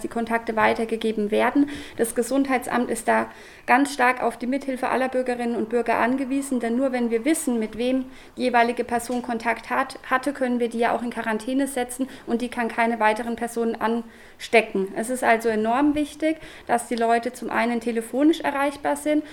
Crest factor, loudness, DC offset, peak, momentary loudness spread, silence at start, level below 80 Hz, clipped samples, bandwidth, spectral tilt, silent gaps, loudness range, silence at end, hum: 20 dB; -23 LUFS; under 0.1%; -2 dBFS; 6 LU; 0 s; -54 dBFS; under 0.1%; 18 kHz; -4 dB/octave; none; 2 LU; 0 s; none